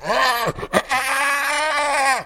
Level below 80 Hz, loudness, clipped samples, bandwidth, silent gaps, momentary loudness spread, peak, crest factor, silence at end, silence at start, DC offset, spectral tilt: -48 dBFS; -19 LUFS; under 0.1%; 17 kHz; none; 3 LU; -4 dBFS; 16 dB; 0 s; 0 s; under 0.1%; -2 dB/octave